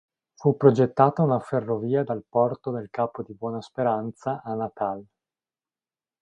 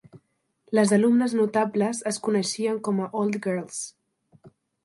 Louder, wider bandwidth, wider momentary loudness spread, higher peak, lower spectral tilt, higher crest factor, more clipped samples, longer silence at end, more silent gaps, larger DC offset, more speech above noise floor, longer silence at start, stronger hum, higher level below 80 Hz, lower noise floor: about the same, -25 LUFS vs -24 LUFS; second, 8.6 kHz vs 11.5 kHz; first, 13 LU vs 10 LU; first, -2 dBFS vs -8 dBFS; first, -9 dB/octave vs -5 dB/octave; first, 24 dB vs 18 dB; neither; first, 1.2 s vs 0.35 s; neither; neither; first, over 66 dB vs 44 dB; first, 0.4 s vs 0.15 s; neither; first, -66 dBFS vs -74 dBFS; first, under -90 dBFS vs -68 dBFS